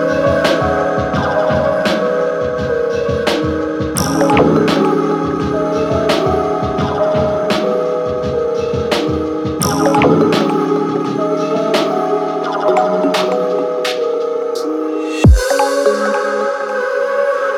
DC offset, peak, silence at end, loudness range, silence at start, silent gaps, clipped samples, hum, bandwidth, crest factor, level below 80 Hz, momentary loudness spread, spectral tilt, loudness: under 0.1%; 0 dBFS; 0 s; 2 LU; 0 s; none; under 0.1%; none; 18.5 kHz; 14 dB; -28 dBFS; 6 LU; -5.5 dB/octave; -15 LUFS